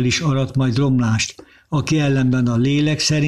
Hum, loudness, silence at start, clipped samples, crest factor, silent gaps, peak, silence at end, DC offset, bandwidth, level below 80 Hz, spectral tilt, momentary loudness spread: none; -18 LUFS; 0 s; under 0.1%; 10 dB; none; -8 dBFS; 0 s; under 0.1%; 12 kHz; -46 dBFS; -5.5 dB/octave; 5 LU